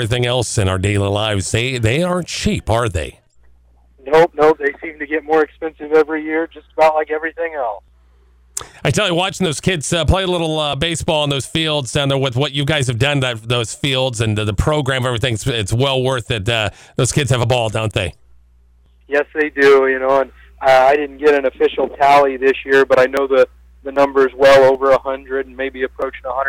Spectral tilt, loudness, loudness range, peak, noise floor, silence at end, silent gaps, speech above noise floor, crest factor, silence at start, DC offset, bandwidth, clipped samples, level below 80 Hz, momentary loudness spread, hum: -4.5 dB/octave; -16 LUFS; 5 LU; -4 dBFS; -50 dBFS; 0 s; none; 35 dB; 12 dB; 0 s; under 0.1%; 16 kHz; under 0.1%; -38 dBFS; 11 LU; none